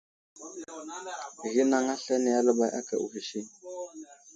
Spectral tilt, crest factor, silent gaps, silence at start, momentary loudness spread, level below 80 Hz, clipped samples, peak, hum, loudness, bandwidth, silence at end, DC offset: -3.5 dB/octave; 20 dB; none; 0.35 s; 18 LU; -80 dBFS; under 0.1%; -10 dBFS; none; -29 LUFS; 9.4 kHz; 0 s; under 0.1%